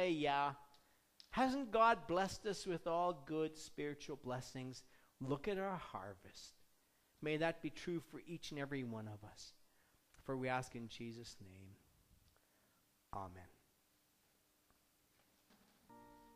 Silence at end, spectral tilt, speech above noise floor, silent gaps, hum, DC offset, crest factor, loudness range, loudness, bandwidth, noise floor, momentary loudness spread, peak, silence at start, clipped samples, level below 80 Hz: 0.05 s; -5 dB/octave; 35 dB; none; none; under 0.1%; 24 dB; 20 LU; -42 LUFS; 15.5 kHz; -77 dBFS; 20 LU; -22 dBFS; 0 s; under 0.1%; -70 dBFS